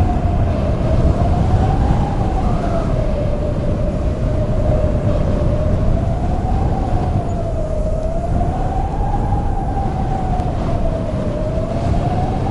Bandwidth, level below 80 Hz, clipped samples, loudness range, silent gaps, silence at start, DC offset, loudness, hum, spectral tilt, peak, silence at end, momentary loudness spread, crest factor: 10.5 kHz; -20 dBFS; under 0.1%; 3 LU; none; 0 s; under 0.1%; -19 LUFS; none; -8.5 dB/octave; -2 dBFS; 0 s; 5 LU; 14 dB